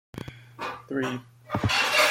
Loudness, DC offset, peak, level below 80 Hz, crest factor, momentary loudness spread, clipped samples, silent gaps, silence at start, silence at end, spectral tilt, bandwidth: -27 LUFS; under 0.1%; -8 dBFS; -54 dBFS; 20 dB; 20 LU; under 0.1%; none; 0.15 s; 0 s; -3.5 dB/octave; 16.5 kHz